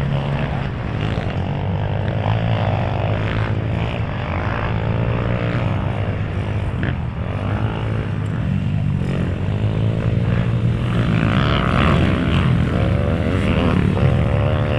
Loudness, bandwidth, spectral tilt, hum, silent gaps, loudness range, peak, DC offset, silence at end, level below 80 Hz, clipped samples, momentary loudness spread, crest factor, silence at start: -20 LUFS; 9.4 kHz; -8 dB/octave; none; none; 5 LU; -2 dBFS; under 0.1%; 0 s; -30 dBFS; under 0.1%; 6 LU; 16 dB; 0 s